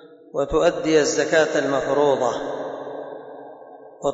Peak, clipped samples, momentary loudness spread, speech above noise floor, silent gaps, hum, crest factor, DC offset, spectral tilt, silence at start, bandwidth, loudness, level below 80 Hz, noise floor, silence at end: -6 dBFS; under 0.1%; 18 LU; 23 dB; none; none; 16 dB; under 0.1%; -4 dB/octave; 0 s; 8 kHz; -21 LUFS; -48 dBFS; -42 dBFS; 0 s